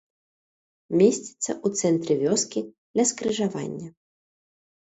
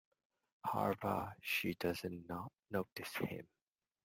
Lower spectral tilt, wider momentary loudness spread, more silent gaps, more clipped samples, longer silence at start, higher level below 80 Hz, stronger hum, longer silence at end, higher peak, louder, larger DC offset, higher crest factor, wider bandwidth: about the same, -4.5 dB/octave vs -5 dB/octave; first, 12 LU vs 9 LU; first, 2.78-2.94 s vs 2.59-2.63 s, 2.92-2.96 s; neither; first, 0.9 s vs 0.65 s; about the same, -68 dBFS vs -72 dBFS; neither; first, 1.05 s vs 0.6 s; first, -6 dBFS vs -22 dBFS; first, -24 LUFS vs -41 LUFS; neither; about the same, 20 dB vs 20 dB; second, 8.2 kHz vs 16.5 kHz